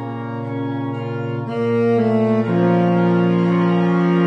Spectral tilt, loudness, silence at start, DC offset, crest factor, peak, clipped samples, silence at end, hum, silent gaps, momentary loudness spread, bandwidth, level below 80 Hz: -9.5 dB/octave; -18 LUFS; 0 s; under 0.1%; 12 dB; -6 dBFS; under 0.1%; 0 s; none; none; 9 LU; 6 kHz; -62 dBFS